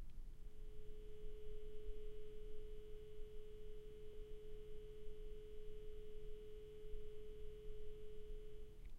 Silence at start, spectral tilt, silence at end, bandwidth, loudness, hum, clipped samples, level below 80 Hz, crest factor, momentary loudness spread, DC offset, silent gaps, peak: 0 s; -6.5 dB/octave; 0 s; 3.9 kHz; -58 LUFS; none; under 0.1%; -52 dBFS; 12 dB; 3 LU; under 0.1%; none; -34 dBFS